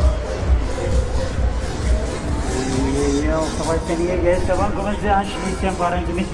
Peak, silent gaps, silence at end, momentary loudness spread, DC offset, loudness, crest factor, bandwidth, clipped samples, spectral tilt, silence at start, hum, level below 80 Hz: -6 dBFS; none; 0 s; 4 LU; under 0.1%; -21 LUFS; 14 dB; 11.5 kHz; under 0.1%; -6 dB/octave; 0 s; none; -24 dBFS